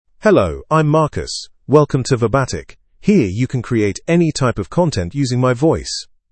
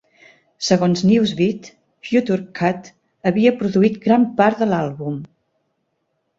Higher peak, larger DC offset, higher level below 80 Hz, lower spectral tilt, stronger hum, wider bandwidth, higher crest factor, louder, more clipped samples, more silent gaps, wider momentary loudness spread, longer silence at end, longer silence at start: about the same, 0 dBFS vs -2 dBFS; neither; first, -40 dBFS vs -58 dBFS; about the same, -6 dB/octave vs -6 dB/octave; neither; first, 8.8 kHz vs 7.8 kHz; about the same, 16 dB vs 18 dB; about the same, -16 LUFS vs -18 LUFS; neither; neither; about the same, 10 LU vs 12 LU; second, 0.3 s vs 1.15 s; second, 0.2 s vs 0.6 s